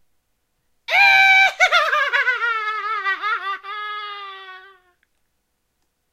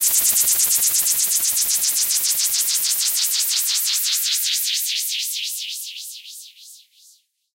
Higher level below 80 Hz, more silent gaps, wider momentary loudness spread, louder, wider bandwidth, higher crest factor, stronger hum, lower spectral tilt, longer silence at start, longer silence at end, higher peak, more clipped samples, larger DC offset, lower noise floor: about the same, -68 dBFS vs -66 dBFS; neither; first, 21 LU vs 14 LU; about the same, -16 LUFS vs -17 LUFS; about the same, 16 kHz vs 16 kHz; about the same, 18 dB vs 18 dB; neither; first, 1.5 dB/octave vs 4 dB/octave; first, 0.9 s vs 0 s; first, 1.5 s vs 0.8 s; about the same, -2 dBFS vs -4 dBFS; neither; neither; first, -71 dBFS vs -55 dBFS